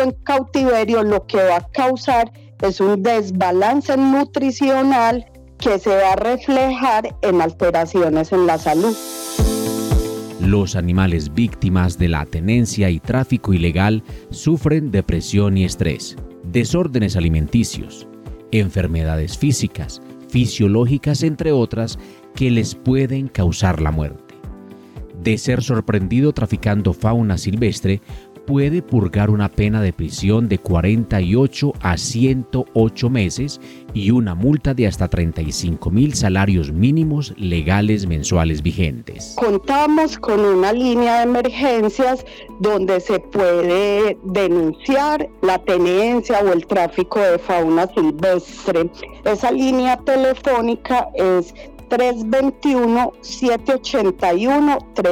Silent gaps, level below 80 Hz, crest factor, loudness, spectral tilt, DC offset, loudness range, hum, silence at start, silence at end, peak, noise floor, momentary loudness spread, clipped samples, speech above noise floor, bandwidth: none; -34 dBFS; 14 dB; -17 LUFS; -6.5 dB/octave; under 0.1%; 3 LU; none; 0 s; 0 s; -4 dBFS; -36 dBFS; 6 LU; under 0.1%; 19 dB; 17.5 kHz